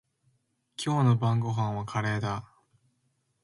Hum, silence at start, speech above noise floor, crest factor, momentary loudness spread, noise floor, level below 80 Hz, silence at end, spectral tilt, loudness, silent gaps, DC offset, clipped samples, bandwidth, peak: none; 0.8 s; 48 dB; 18 dB; 12 LU; -74 dBFS; -60 dBFS; 1 s; -6.5 dB/octave; -28 LUFS; none; under 0.1%; under 0.1%; 11.5 kHz; -12 dBFS